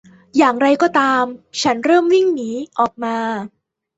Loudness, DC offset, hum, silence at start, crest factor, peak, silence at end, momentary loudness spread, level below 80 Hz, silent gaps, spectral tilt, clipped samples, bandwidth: -17 LUFS; under 0.1%; none; 0.35 s; 16 dB; -2 dBFS; 0.5 s; 10 LU; -62 dBFS; none; -4 dB/octave; under 0.1%; 8 kHz